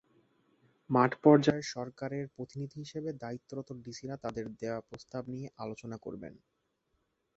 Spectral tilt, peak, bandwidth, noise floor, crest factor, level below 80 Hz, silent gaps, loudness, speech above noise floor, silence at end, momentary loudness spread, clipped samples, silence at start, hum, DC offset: -6 dB/octave; -8 dBFS; 8 kHz; -79 dBFS; 26 dB; -68 dBFS; none; -33 LUFS; 46 dB; 1.05 s; 18 LU; under 0.1%; 0.9 s; none; under 0.1%